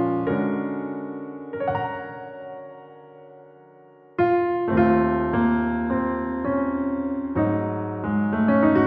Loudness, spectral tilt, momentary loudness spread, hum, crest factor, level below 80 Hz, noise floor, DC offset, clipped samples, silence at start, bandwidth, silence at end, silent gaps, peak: -24 LUFS; -11 dB/octave; 16 LU; none; 16 dB; -46 dBFS; -50 dBFS; under 0.1%; under 0.1%; 0 s; 4.6 kHz; 0 s; none; -6 dBFS